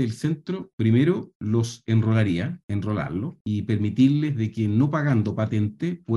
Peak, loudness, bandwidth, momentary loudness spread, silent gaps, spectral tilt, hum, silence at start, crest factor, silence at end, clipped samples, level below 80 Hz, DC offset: -8 dBFS; -24 LUFS; 11.5 kHz; 9 LU; 0.73-0.78 s, 1.35-1.40 s, 2.63-2.68 s, 3.41-3.45 s; -8 dB/octave; none; 0 s; 14 dB; 0 s; under 0.1%; -56 dBFS; under 0.1%